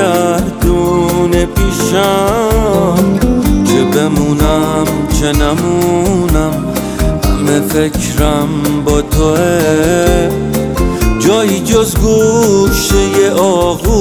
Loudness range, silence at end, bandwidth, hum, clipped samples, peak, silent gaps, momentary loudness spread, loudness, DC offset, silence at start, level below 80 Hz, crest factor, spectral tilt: 2 LU; 0 s; 18.5 kHz; none; under 0.1%; 0 dBFS; none; 4 LU; -11 LUFS; 0.1%; 0 s; -20 dBFS; 10 dB; -5.5 dB/octave